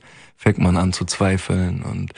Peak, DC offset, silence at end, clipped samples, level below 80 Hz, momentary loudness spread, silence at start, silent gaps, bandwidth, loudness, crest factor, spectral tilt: -2 dBFS; under 0.1%; 0.1 s; under 0.1%; -40 dBFS; 5 LU; 0.4 s; none; 10.5 kHz; -20 LUFS; 18 dB; -6 dB/octave